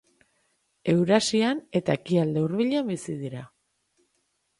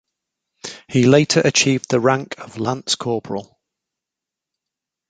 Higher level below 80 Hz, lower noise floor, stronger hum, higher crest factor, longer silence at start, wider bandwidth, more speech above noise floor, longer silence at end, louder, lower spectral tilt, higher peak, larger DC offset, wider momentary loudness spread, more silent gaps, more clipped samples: second, -66 dBFS vs -58 dBFS; second, -73 dBFS vs -86 dBFS; neither; about the same, 20 dB vs 18 dB; first, 0.85 s vs 0.65 s; first, 11.5 kHz vs 9.4 kHz; second, 49 dB vs 68 dB; second, 1.1 s vs 1.65 s; second, -25 LUFS vs -17 LUFS; about the same, -5.5 dB/octave vs -4.5 dB/octave; second, -6 dBFS vs -2 dBFS; neither; second, 13 LU vs 18 LU; neither; neither